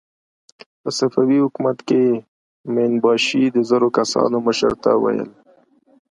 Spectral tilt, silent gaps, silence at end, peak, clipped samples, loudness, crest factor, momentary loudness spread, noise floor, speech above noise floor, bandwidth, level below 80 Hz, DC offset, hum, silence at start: -5 dB/octave; 2.28-2.64 s; 0.8 s; -2 dBFS; under 0.1%; -18 LUFS; 16 dB; 9 LU; -54 dBFS; 37 dB; 11.5 kHz; -58 dBFS; under 0.1%; none; 0.85 s